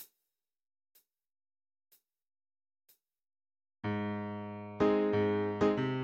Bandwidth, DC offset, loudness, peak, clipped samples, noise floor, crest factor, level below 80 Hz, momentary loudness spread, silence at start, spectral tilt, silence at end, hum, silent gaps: 16.5 kHz; under 0.1%; -33 LUFS; -18 dBFS; under 0.1%; -89 dBFS; 20 dB; -66 dBFS; 13 LU; 0 s; -8 dB/octave; 0 s; none; none